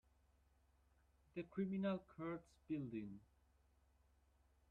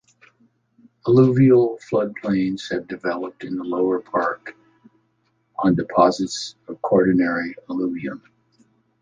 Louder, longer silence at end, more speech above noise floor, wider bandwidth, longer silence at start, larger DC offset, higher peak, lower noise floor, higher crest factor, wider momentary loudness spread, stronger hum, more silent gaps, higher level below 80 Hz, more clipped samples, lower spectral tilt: second, -48 LUFS vs -20 LUFS; first, 1.5 s vs 0.85 s; second, 30 dB vs 47 dB; second, 7 kHz vs 9.4 kHz; first, 1.35 s vs 1.05 s; neither; second, -32 dBFS vs -2 dBFS; first, -76 dBFS vs -67 dBFS; about the same, 18 dB vs 20 dB; second, 12 LU vs 15 LU; neither; neither; second, -76 dBFS vs -56 dBFS; neither; first, -9 dB/octave vs -7 dB/octave